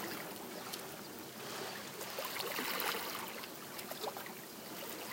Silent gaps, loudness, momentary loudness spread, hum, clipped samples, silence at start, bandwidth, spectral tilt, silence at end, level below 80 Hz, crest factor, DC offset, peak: none; -42 LUFS; 10 LU; none; under 0.1%; 0 s; 17 kHz; -2 dB/octave; 0 s; -82 dBFS; 26 dB; under 0.1%; -16 dBFS